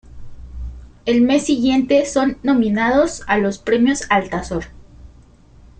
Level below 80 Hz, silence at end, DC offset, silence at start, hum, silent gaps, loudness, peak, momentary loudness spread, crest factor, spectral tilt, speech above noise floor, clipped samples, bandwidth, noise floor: -38 dBFS; 0.7 s; under 0.1%; 0.05 s; none; none; -17 LUFS; -2 dBFS; 19 LU; 16 dB; -5 dB/octave; 30 dB; under 0.1%; 9.4 kHz; -46 dBFS